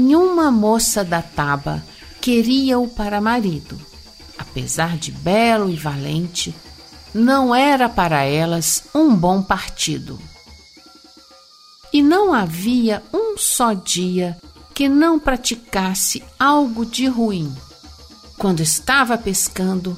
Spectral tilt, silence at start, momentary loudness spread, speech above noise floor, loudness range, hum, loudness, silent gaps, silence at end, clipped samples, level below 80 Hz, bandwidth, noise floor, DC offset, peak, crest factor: -4 dB/octave; 0 s; 13 LU; 29 dB; 4 LU; none; -17 LUFS; none; 0 s; under 0.1%; -40 dBFS; 16 kHz; -47 dBFS; under 0.1%; -4 dBFS; 14 dB